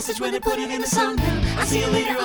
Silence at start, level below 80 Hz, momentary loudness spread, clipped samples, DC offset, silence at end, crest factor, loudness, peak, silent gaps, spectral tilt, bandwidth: 0 s; -32 dBFS; 4 LU; under 0.1%; under 0.1%; 0 s; 14 dB; -22 LUFS; -8 dBFS; none; -4 dB/octave; over 20 kHz